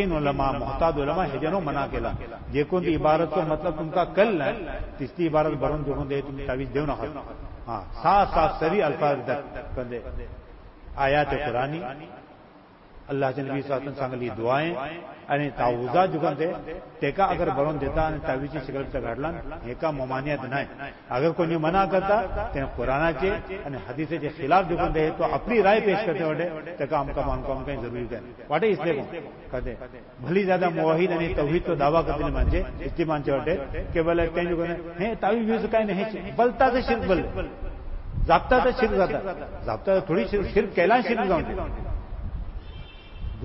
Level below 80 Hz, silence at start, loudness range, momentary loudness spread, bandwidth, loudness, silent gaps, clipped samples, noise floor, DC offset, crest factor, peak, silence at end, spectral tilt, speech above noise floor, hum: -38 dBFS; 0 s; 5 LU; 14 LU; 5.8 kHz; -25 LUFS; none; under 0.1%; -50 dBFS; under 0.1%; 20 dB; -6 dBFS; 0 s; -10.5 dB/octave; 25 dB; none